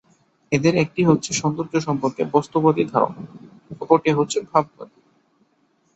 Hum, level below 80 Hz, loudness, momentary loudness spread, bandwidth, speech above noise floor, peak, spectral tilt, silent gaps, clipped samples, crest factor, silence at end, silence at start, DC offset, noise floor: none; -58 dBFS; -20 LUFS; 14 LU; 8.2 kHz; 44 dB; -2 dBFS; -5.5 dB/octave; none; under 0.1%; 20 dB; 1.1 s; 0.5 s; under 0.1%; -64 dBFS